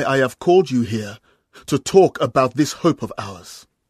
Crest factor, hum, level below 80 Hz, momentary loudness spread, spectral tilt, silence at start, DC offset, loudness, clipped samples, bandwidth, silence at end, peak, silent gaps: 18 dB; none; -56 dBFS; 19 LU; -5.5 dB/octave; 0 s; under 0.1%; -18 LUFS; under 0.1%; 14 kHz; 0.3 s; 0 dBFS; none